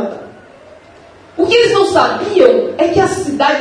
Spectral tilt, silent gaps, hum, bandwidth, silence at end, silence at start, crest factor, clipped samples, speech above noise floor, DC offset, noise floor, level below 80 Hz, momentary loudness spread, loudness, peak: -4.5 dB/octave; none; none; 10.5 kHz; 0 s; 0 s; 14 dB; 0.2%; 29 dB; under 0.1%; -40 dBFS; -48 dBFS; 12 LU; -12 LUFS; 0 dBFS